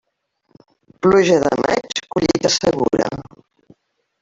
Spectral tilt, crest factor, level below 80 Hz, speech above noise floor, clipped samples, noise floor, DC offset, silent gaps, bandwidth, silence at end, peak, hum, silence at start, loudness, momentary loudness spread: -4.5 dB/octave; 18 dB; -50 dBFS; 51 dB; under 0.1%; -66 dBFS; under 0.1%; none; 7.8 kHz; 1 s; -2 dBFS; none; 1.05 s; -17 LUFS; 9 LU